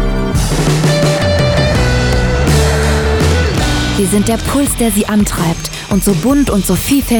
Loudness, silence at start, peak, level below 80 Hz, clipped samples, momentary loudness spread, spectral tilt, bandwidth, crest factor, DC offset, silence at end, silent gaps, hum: -12 LUFS; 0 s; -2 dBFS; -20 dBFS; under 0.1%; 3 LU; -5 dB/octave; over 20 kHz; 10 dB; under 0.1%; 0 s; none; none